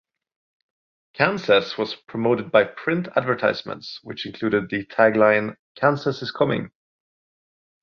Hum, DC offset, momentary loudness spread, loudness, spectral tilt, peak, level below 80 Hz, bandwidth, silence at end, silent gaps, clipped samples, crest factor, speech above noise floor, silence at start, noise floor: none; under 0.1%; 15 LU; -21 LUFS; -6.5 dB/octave; -2 dBFS; -62 dBFS; 6.8 kHz; 1.15 s; 5.59-5.75 s; under 0.1%; 20 dB; over 69 dB; 1.2 s; under -90 dBFS